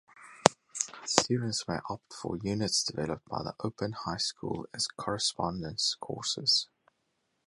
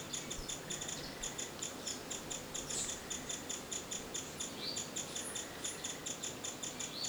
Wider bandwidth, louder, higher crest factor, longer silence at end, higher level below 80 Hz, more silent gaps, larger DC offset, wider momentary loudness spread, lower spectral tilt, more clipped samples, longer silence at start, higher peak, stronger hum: second, 11.5 kHz vs over 20 kHz; first, -31 LUFS vs -41 LUFS; first, 32 dB vs 18 dB; first, 0.8 s vs 0 s; about the same, -60 dBFS vs -62 dBFS; neither; neither; first, 10 LU vs 3 LU; first, -3 dB/octave vs -1.5 dB/octave; neither; first, 0.15 s vs 0 s; first, 0 dBFS vs -24 dBFS; neither